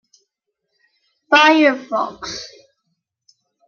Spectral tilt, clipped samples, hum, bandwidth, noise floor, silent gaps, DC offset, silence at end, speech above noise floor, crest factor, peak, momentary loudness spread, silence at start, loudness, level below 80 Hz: -2.5 dB/octave; under 0.1%; none; 7.2 kHz; -76 dBFS; none; under 0.1%; 1.2 s; 61 dB; 20 dB; 0 dBFS; 19 LU; 1.3 s; -15 LUFS; -62 dBFS